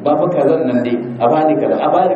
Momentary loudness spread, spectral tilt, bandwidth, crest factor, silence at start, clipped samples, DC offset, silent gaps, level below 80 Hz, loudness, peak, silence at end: 3 LU; -9 dB/octave; 7.2 kHz; 12 dB; 0 s; under 0.1%; under 0.1%; none; -64 dBFS; -14 LUFS; -2 dBFS; 0 s